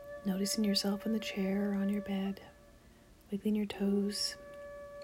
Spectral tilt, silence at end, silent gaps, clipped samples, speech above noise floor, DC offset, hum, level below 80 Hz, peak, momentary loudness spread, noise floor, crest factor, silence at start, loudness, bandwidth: -5 dB/octave; 0 s; none; under 0.1%; 26 dB; under 0.1%; none; -64 dBFS; -18 dBFS; 16 LU; -60 dBFS; 16 dB; 0 s; -34 LUFS; 16 kHz